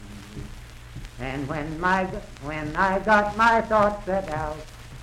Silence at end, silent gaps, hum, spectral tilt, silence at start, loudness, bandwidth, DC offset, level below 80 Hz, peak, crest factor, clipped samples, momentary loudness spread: 0 s; none; none; -5.5 dB/octave; 0 s; -23 LUFS; 15.5 kHz; under 0.1%; -42 dBFS; -6 dBFS; 18 dB; under 0.1%; 22 LU